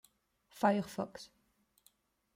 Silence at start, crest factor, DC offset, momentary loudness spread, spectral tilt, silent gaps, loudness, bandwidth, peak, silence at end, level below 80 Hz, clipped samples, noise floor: 0.55 s; 22 dB; under 0.1%; 21 LU; -6 dB/octave; none; -35 LUFS; 16 kHz; -16 dBFS; 1.1 s; -76 dBFS; under 0.1%; -75 dBFS